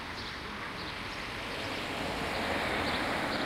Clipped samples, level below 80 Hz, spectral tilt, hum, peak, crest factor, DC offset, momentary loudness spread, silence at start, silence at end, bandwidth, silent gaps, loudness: under 0.1%; -52 dBFS; -4 dB/octave; none; -20 dBFS; 16 dB; under 0.1%; 7 LU; 0 s; 0 s; 16 kHz; none; -34 LUFS